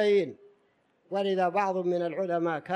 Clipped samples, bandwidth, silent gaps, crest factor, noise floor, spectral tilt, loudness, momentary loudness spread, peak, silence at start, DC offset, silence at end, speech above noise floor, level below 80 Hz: under 0.1%; 9.4 kHz; none; 16 dB; -69 dBFS; -6.5 dB/octave; -29 LUFS; 6 LU; -12 dBFS; 0 s; under 0.1%; 0 s; 41 dB; -84 dBFS